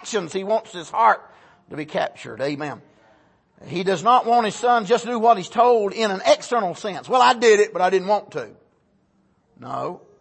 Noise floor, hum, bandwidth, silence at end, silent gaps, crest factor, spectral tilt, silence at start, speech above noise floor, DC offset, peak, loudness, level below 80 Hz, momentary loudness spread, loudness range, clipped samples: -63 dBFS; none; 8.8 kHz; 0.25 s; none; 18 dB; -4 dB/octave; 0 s; 43 dB; under 0.1%; -4 dBFS; -20 LUFS; -70 dBFS; 16 LU; 7 LU; under 0.1%